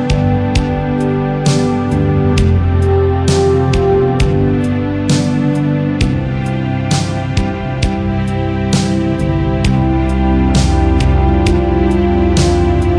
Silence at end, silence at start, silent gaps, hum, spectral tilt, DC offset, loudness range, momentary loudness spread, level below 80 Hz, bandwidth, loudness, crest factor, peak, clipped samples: 0 s; 0 s; none; none; -6.5 dB/octave; under 0.1%; 3 LU; 5 LU; -20 dBFS; 10.5 kHz; -14 LUFS; 10 dB; -2 dBFS; under 0.1%